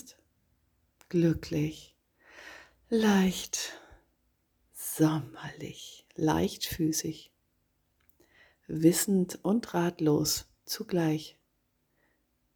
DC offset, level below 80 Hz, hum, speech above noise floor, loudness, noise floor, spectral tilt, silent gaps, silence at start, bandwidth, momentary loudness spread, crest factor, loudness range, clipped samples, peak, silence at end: under 0.1%; -58 dBFS; none; 47 dB; -29 LUFS; -75 dBFS; -5 dB/octave; none; 0.05 s; over 20 kHz; 21 LU; 22 dB; 5 LU; under 0.1%; -10 dBFS; 1.25 s